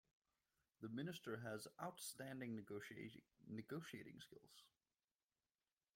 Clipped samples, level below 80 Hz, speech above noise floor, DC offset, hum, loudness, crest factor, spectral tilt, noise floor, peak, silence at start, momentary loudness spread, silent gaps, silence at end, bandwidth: under 0.1%; -88 dBFS; over 37 dB; under 0.1%; none; -53 LUFS; 20 dB; -4.5 dB/octave; under -90 dBFS; -34 dBFS; 0.8 s; 13 LU; none; 1.3 s; 16.5 kHz